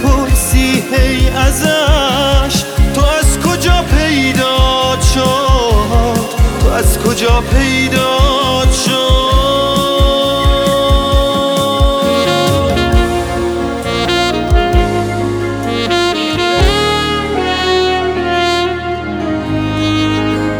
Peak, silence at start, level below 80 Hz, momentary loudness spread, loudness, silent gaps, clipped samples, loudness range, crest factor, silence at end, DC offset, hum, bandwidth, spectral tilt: 0 dBFS; 0 s; -16 dBFS; 5 LU; -12 LUFS; none; under 0.1%; 2 LU; 10 dB; 0 s; under 0.1%; none; 19 kHz; -4.5 dB/octave